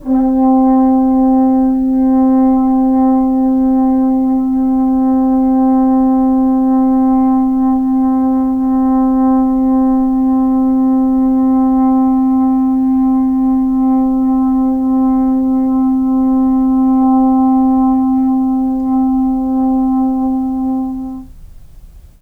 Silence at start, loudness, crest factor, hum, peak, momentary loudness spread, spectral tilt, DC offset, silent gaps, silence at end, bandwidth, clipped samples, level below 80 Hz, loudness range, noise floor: 0 s; -12 LUFS; 8 dB; none; -4 dBFS; 3 LU; -9.5 dB/octave; under 0.1%; none; 0.2 s; 1.9 kHz; under 0.1%; -36 dBFS; 2 LU; -36 dBFS